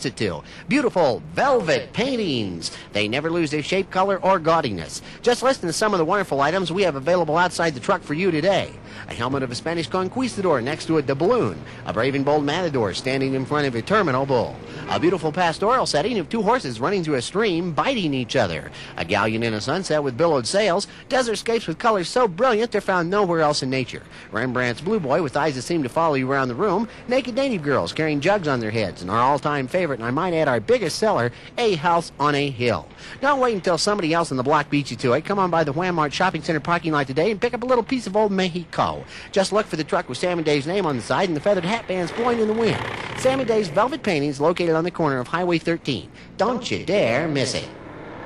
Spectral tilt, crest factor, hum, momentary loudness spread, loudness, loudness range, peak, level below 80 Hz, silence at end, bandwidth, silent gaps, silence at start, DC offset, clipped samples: -5 dB/octave; 12 dB; none; 6 LU; -22 LUFS; 2 LU; -8 dBFS; -52 dBFS; 0 s; 12.5 kHz; none; 0 s; under 0.1%; under 0.1%